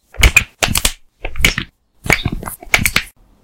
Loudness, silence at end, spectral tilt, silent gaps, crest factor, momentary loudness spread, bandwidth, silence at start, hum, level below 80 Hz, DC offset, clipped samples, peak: -15 LUFS; 0.35 s; -2.5 dB/octave; none; 16 dB; 20 LU; over 20 kHz; 0.15 s; none; -24 dBFS; under 0.1%; 0.3%; 0 dBFS